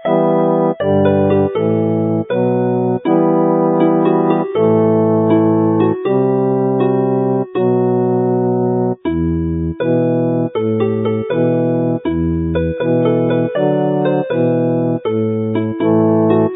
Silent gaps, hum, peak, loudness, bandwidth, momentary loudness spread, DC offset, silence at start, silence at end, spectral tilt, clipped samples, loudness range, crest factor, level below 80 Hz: none; none; 0 dBFS; -15 LUFS; 3.9 kHz; 5 LU; under 0.1%; 0 s; 0 s; -14 dB/octave; under 0.1%; 3 LU; 14 dB; -38 dBFS